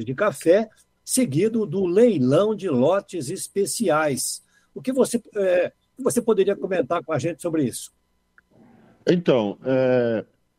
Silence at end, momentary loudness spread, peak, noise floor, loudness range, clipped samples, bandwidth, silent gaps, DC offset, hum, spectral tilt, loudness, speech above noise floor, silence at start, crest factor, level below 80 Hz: 0.35 s; 10 LU; -6 dBFS; -62 dBFS; 4 LU; under 0.1%; 16 kHz; none; under 0.1%; none; -5 dB/octave; -22 LUFS; 40 dB; 0 s; 18 dB; -64 dBFS